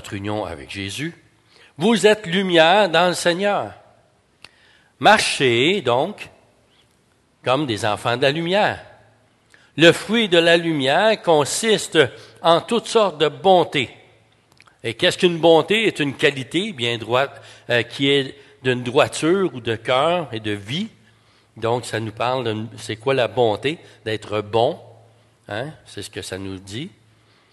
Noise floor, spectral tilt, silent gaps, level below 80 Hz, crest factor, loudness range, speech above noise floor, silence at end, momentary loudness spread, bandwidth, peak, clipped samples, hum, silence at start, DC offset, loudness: -60 dBFS; -4 dB/octave; none; -56 dBFS; 20 dB; 6 LU; 41 dB; 0.65 s; 15 LU; 12.5 kHz; 0 dBFS; under 0.1%; none; 0.05 s; under 0.1%; -19 LUFS